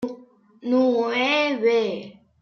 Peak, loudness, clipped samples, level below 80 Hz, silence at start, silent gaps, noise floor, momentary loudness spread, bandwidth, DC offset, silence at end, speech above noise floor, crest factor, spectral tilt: -10 dBFS; -21 LUFS; under 0.1%; -72 dBFS; 0 s; none; -49 dBFS; 14 LU; 6.8 kHz; under 0.1%; 0.3 s; 28 dB; 14 dB; -4.5 dB/octave